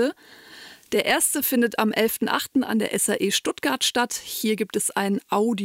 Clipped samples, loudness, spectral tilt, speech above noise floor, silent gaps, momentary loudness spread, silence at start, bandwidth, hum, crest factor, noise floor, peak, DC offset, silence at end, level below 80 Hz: under 0.1%; -23 LUFS; -2.5 dB/octave; 22 dB; none; 6 LU; 0 s; 16 kHz; none; 16 dB; -46 dBFS; -8 dBFS; under 0.1%; 0 s; -64 dBFS